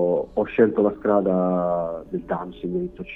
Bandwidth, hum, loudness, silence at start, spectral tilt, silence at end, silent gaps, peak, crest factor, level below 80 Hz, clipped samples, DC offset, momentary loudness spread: 3.9 kHz; none; -23 LUFS; 0 s; -10.5 dB/octave; 0 s; none; -4 dBFS; 18 dB; -50 dBFS; under 0.1%; under 0.1%; 10 LU